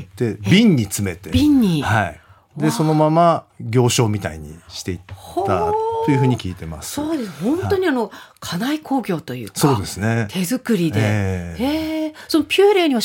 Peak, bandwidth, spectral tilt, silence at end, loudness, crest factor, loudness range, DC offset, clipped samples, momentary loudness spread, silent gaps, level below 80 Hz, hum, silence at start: -2 dBFS; 17 kHz; -5.5 dB/octave; 0 s; -19 LUFS; 16 dB; 4 LU; under 0.1%; under 0.1%; 14 LU; none; -46 dBFS; none; 0 s